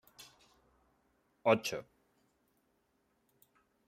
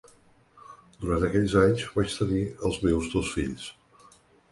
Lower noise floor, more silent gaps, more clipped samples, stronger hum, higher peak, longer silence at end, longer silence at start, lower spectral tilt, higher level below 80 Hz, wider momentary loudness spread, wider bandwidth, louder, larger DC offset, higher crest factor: first, -77 dBFS vs -59 dBFS; neither; neither; neither; second, -14 dBFS vs -8 dBFS; first, 2.05 s vs 0.8 s; second, 0.2 s vs 0.7 s; second, -4.5 dB/octave vs -6 dB/octave; second, -80 dBFS vs -42 dBFS; first, 25 LU vs 12 LU; first, 15.5 kHz vs 11.5 kHz; second, -34 LUFS vs -26 LUFS; neither; first, 28 dB vs 20 dB